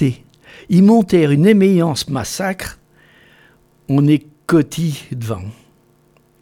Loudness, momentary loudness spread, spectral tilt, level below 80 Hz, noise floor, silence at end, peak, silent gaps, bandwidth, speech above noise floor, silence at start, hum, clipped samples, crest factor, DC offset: -15 LUFS; 16 LU; -6.5 dB/octave; -48 dBFS; -54 dBFS; 0.9 s; 0 dBFS; none; 16.5 kHz; 40 dB; 0 s; none; under 0.1%; 16 dB; under 0.1%